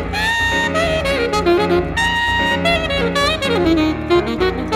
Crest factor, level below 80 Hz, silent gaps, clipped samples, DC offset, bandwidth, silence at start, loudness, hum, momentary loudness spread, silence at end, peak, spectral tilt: 12 dB; -32 dBFS; none; under 0.1%; under 0.1%; 16 kHz; 0 s; -16 LUFS; none; 2 LU; 0 s; -4 dBFS; -4.5 dB/octave